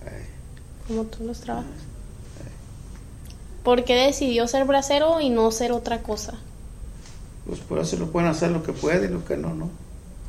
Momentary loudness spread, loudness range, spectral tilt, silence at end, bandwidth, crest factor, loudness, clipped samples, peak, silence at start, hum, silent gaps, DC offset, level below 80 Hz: 22 LU; 11 LU; -4.5 dB/octave; 0 s; 15.5 kHz; 18 dB; -23 LUFS; under 0.1%; -6 dBFS; 0 s; none; none; under 0.1%; -40 dBFS